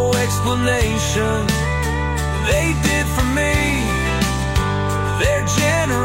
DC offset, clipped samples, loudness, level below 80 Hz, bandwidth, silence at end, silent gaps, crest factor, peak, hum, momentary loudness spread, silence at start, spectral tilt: under 0.1%; under 0.1%; -18 LUFS; -26 dBFS; 16.5 kHz; 0 s; none; 14 dB; -4 dBFS; none; 3 LU; 0 s; -4.5 dB/octave